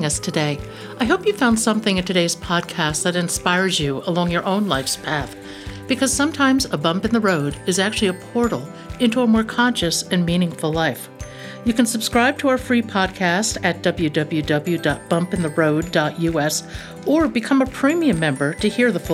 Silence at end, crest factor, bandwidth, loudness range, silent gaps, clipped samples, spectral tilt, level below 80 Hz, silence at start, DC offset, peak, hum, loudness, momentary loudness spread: 0 s; 16 dB; 16 kHz; 1 LU; none; under 0.1%; -4.5 dB/octave; -42 dBFS; 0 s; under 0.1%; -4 dBFS; none; -19 LUFS; 7 LU